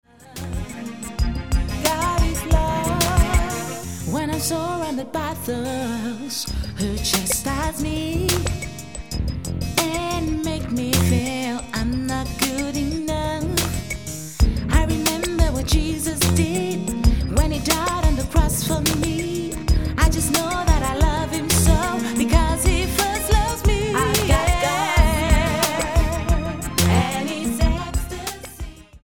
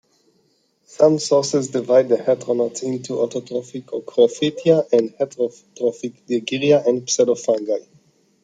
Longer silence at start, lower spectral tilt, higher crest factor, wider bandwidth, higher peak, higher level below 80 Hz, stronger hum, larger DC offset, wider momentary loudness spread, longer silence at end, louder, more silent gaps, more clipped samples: second, 0.05 s vs 1 s; about the same, -4.5 dB/octave vs -4.5 dB/octave; about the same, 18 dB vs 18 dB; first, 17.5 kHz vs 9.4 kHz; about the same, -2 dBFS vs -2 dBFS; first, -24 dBFS vs -68 dBFS; neither; first, 0.6% vs under 0.1%; about the same, 9 LU vs 10 LU; second, 0.05 s vs 0.65 s; about the same, -21 LUFS vs -19 LUFS; neither; neither